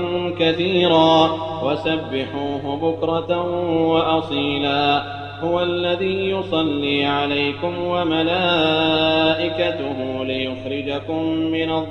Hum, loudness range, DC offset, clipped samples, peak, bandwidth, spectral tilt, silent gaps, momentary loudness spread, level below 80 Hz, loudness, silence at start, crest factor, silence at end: none; 2 LU; under 0.1%; under 0.1%; -2 dBFS; 6.6 kHz; -6.5 dB/octave; none; 8 LU; -52 dBFS; -20 LUFS; 0 s; 18 dB; 0 s